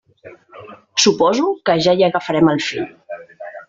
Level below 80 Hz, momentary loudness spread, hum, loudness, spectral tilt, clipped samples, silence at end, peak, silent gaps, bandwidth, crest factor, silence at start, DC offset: -56 dBFS; 20 LU; none; -16 LUFS; -4 dB/octave; under 0.1%; 0.05 s; -2 dBFS; none; 7.8 kHz; 16 dB; 0.25 s; under 0.1%